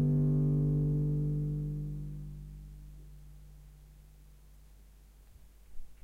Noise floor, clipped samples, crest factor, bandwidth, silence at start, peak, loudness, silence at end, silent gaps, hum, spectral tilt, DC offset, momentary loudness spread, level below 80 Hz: -57 dBFS; under 0.1%; 12 dB; 1.6 kHz; 0 s; -22 dBFS; -32 LUFS; 0.1 s; none; none; -11 dB/octave; under 0.1%; 25 LU; -46 dBFS